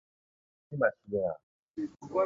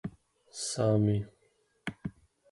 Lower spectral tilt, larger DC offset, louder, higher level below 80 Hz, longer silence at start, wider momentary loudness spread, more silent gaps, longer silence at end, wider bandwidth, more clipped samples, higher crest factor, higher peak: first, -8.5 dB/octave vs -6 dB/octave; neither; second, -34 LUFS vs -31 LUFS; second, -68 dBFS vs -58 dBFS; first, 0.7 s vs 0.05 s; second, 14 LU vs 19 LU; first, 1.43-1.68 s vs none; second, 0 s vs 0.4 s; second, 7.4 kHz vs 11.5 kHz; neither; about the same, 22 dB vs 18 dB; first, -12 dBFS vs -16 dBFS